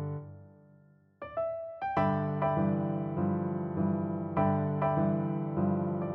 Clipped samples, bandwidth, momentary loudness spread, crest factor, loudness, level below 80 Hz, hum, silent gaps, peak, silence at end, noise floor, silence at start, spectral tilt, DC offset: under 0.1%; 4.2 kHz; 8 LU; 16 dB; -31 LUFS; -62 dBFS; none; none; -14 dBFS; 0 s; -61 dBFS; 0 s; -11.5 dB/octave; under 0.1%